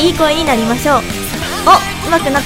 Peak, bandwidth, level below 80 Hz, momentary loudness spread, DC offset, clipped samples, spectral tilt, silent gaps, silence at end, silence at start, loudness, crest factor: 0 dBFS; 17 kHz; -30 dBFS; 9 LU; under 0.1%; 0.5%; -4 dB/octave; none; 0 s; 0 s; -12 LUFS; 12 dB